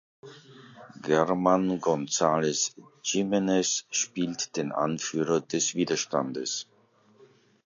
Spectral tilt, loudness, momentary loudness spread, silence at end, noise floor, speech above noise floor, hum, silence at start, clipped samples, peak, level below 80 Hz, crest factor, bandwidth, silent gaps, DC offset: -3.5 dB/octave; -27 LUFS; 7 LU; 1.05 s; -61 dBFS; 33 dB; none; 0.25 s; under 0.1%; -8 dBFS; -68 dBFS; 20 dB; 7.6 kHz; none; under 0.1%